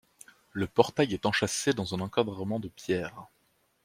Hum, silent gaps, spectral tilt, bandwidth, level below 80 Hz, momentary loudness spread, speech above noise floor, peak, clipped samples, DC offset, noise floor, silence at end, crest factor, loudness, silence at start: none; none; -4.5 dB/octave; 16 kHz; -62 dBFS; 10 LU; 42 dB; -4 dBFS; under 0.1%; under 0.1%; -71 dBFS; 0.6 s; 26 dB; -29 LUFS; 0.55 s